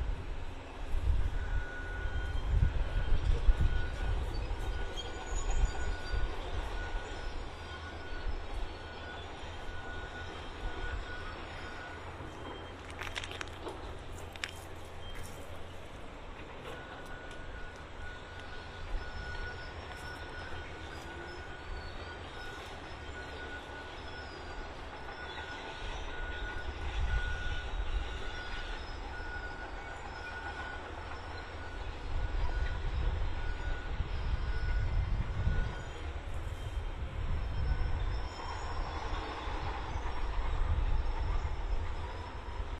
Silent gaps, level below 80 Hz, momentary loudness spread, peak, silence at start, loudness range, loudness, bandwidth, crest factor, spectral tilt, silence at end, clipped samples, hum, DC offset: none; -38 dBFS; 10 LU; -12 dBFS; 0 s; 8 LU; -40 LUFS; 11 kHz; 24 dB; -5 dB/octave; 0 s; under 0.1%; none; under 0.1%